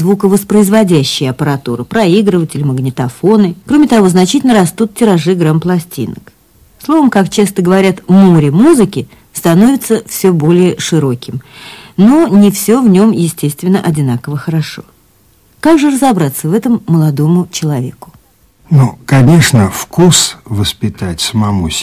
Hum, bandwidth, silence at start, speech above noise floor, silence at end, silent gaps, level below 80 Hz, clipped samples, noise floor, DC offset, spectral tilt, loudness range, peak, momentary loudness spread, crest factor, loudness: none; 16 kHz; 0 s; 39 dB; 0 s; none; -38 dBFS; 0.1%; -48 dBFS; under 0.1%; -6 dB/octave; 3 LU; 0 dBFS; 10 LU; 10 dB; -10 LUFS